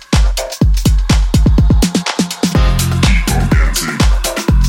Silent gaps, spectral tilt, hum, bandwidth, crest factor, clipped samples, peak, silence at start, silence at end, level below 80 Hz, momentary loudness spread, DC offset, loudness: none; -5 dB/octave; none; 17 kHz; 12 dB; under 0.1%; 0 dBFS; 0.1 s; 0 s; -14 dBFS; 4 LU; under 0.1%; -13 LUFS